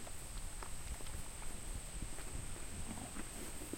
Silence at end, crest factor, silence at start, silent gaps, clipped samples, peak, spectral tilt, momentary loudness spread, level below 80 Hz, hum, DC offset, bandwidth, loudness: 0 s; 14 dB; 0 s; none; under 0.1%; -30 dBFS; -3 dB/octave; 2 LU; -48 dBFS; none; under 0.1%; 16.5 kHz; -47 LUFS